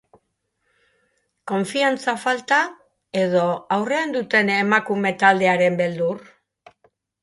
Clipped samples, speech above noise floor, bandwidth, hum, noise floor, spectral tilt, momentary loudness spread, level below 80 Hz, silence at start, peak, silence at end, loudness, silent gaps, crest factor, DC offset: under 0.1%; 53 dB; 11.5 kHz; none; -73 dBFS; -5 dB/octave; 9 LU; -70 dBFS; 1.45 s; -2 dBFS; 1.05 s; -20 LUFS; none; 20 dB; under 0.1%